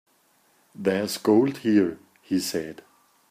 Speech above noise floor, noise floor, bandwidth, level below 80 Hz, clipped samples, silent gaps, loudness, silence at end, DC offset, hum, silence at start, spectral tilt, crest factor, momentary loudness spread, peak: 41 dB; -64 dBFS; 15.5 kHz; -70 dBFS; under 0.1%; none; -24 LUFS; 0.6 s; under 0.1%; none; 0.8 s; -5 dB/octave; 18 dB; 11 LU; -8 dBFS